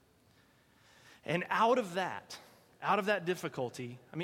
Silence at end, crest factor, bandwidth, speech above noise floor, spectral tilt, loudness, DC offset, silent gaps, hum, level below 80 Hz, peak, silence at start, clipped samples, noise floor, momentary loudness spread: 0 s; 20 dB; 16.5 kHz; 33 dB; -5 dB/octave; -34 LUFS; under 0.1%; none; none; -78 dBFS; -16 dBFS; 1.25 s; under 0.1%; -67 dBFS; 17 LU